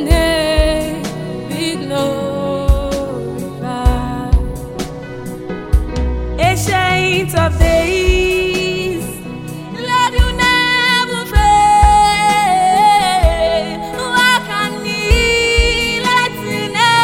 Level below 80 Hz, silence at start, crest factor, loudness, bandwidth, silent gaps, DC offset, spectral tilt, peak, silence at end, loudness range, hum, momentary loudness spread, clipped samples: -20 dBFS; 0 s; 14 dB; -14 LUFS; 17 kHz; none; 0.2%; -4.5 dB/octave; 0 dBFS; 0 s; 8 LU; none; 13 LU; under 0.1%